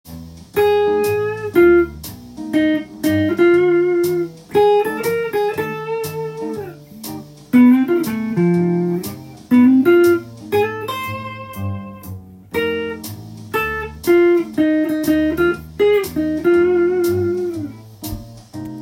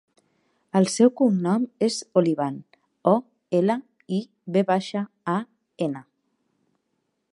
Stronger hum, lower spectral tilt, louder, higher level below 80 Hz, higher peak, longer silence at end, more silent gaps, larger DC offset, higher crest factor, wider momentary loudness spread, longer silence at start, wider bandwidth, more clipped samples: neither; about the same, -6.5 dB/octave vs -6 dB/octave; first, -17 LUFS vs -24 LUFS; first, -46 dBFS vs -78 dBFS; about the same, -2 dBFS vs -4 dBFS; second, 0 s vs 1.35 s; neither; neither; second, 14 dB vs 20 dB; first, 19 LU vs 11 LU; second, 0.05 s vs 0.75 s; first, 16.5 kHz vs 11.5 kHz; neither